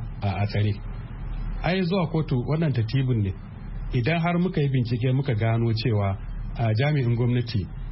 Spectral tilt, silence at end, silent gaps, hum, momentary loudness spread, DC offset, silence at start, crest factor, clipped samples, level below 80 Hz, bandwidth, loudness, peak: -11.5 dB/octave; 0 s; none; none; 12 LU; under 0.1%; 0 s; 12 dB; under 0.1%; -38 dBFS; 5.8 kHz; -25 LUFS; -12 dBFS